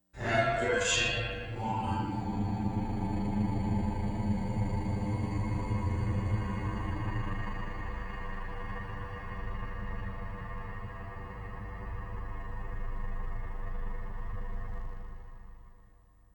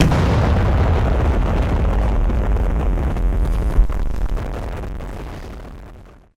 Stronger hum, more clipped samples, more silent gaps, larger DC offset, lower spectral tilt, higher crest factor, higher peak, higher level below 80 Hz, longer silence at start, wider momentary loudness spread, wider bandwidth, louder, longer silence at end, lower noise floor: neither; neither; neither; neither; second, -5.5 dB/octave vs -7.5 dB/octave; about the same, 18 dB vs 14 dB; second, -14 dBFS vs -2 dBFS; second, -38 dBFS vs -20 dBFS; first, 0.15 s vs 0 s; about the same, 14 LU vs 16 LU; first, 10 kHz vs 9 kHz; second, -35 LUFS vs -20 LUFS; first, 0.5 s vs 0.25 s; first, -59 dBFS vs -41 dBFS